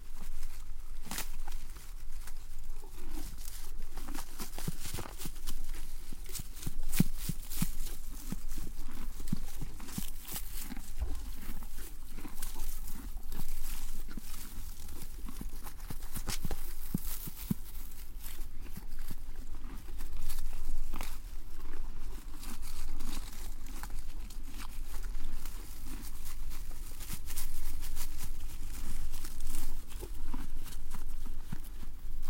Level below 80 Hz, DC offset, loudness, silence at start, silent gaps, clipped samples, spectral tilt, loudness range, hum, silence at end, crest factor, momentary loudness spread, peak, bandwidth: -36 dBFS; under 0.1%; -43 LUFS; 0 s; none; under 0.1%; -4 dB/octave; 6 LU; none; 0 s; 18 dB; 8 LU; -10 dBFS; 16.5 kHz